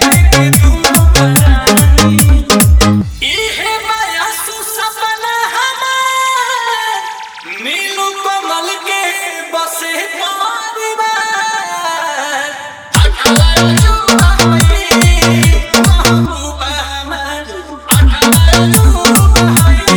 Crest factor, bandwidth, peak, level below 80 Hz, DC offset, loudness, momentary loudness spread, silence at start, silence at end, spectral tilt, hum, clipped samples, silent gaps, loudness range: 10 dB; over 20 kHz; 0 dBFS; -16 dBFS; under 0.1%; -10 LUFS; 10 LU; 0 s; 0 s; -4 dB/octave; none; 0.4%; none; 7 LU